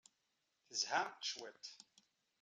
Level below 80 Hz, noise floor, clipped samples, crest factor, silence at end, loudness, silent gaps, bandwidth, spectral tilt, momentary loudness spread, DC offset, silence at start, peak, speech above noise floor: under -90 dBFS; -85 dBFS; under 0.1%; 22 dB; 0.65 s; -42 LUFS; none; 12.5 kHz; 0.5 dB/octave; 16 LU; under 0.1%; 0.7 s; -24 dBFS; 42 dB